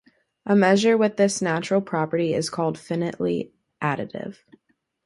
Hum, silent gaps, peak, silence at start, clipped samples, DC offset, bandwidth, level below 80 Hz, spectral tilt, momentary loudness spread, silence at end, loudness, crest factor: none; none; -6 dBFS; 0.45 s; under 0.1%; under 0.1%; 11.5 kHz; -64 dBFS; -5.5 dB/octave; 15 LU; 0.75 s; -23 LUFS; 18 dB